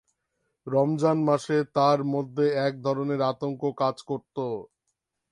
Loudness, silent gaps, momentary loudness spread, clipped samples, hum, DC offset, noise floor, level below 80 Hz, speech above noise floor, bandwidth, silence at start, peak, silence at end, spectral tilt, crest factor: -26 LUFS; none; 10 LU; under 0.1%; none; under 0.1%; -80 dBFS; -72 dBFS; 55 dB; 11.5 kHz; 0.65 s; -8 dBFS; 0.65 s; -7 dB/octave; 18 dB